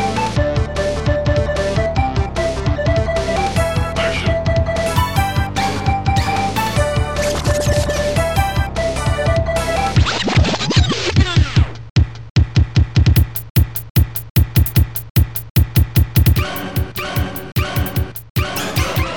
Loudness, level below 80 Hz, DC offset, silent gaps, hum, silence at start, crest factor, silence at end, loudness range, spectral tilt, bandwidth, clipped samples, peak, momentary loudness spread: -17 LUFS; -24 dBFS; 1%; 11.90-11.96 s, 12.30-12.35 s, 13.50-13.55 s, 13.90-13.95 s, 14.30-14.35 s, 15.10-15.15 s, 15.50-15.55 s, 18.30-18.35 s; none; 0 s; 14 dB; 0 s; 2 LU; -5.5 dB/octave; 19 kHz; under 0.1%; -2 dBFS; 5 LU